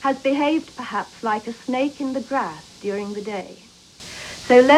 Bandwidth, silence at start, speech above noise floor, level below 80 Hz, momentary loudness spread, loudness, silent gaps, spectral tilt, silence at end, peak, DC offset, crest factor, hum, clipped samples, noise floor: 12 kHz; 0 s; 20 dB; -58 dBFS; 13 LU; -23 LUFS; none; -4.5 dB/octave; 0 s; 0 dBFS; under 0.1%; 22 dB; none; under 0.1%; -40 dBFS